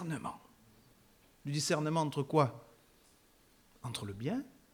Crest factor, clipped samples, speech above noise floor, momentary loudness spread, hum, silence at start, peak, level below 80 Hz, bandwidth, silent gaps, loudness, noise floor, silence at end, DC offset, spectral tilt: 24 dB; under 0.1%; 32 dB; 16 LU; none; 0 s; -14 dBFS; -70 dBFS; 19.5 kHz; none; -35 LUFS; -66 dBFS; 0.25 s; under 0.1%; -5 dB/octave